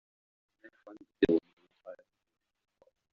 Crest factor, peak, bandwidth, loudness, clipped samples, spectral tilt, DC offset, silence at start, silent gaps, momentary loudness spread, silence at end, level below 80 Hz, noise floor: 26 dB; -12 dBFS; 6.6 kHz; -30 LUFS; under 0.1%; -5.5 dB/octave; under 0.1%; 0.9 s; 1.53-1.57 s; 26 LU; 1.2 s; -64 dBFS; -53 dBFS